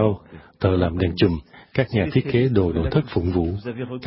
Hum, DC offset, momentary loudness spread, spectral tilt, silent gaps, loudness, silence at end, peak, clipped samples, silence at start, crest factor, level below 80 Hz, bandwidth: none; under 0.1%; 9 LU; -12 dB/octave; none; -22 LUFS; 0 s; -4 dBFS; under 0.1%; 0 s; 18 dB; -34 dBFS; 5.8 kHz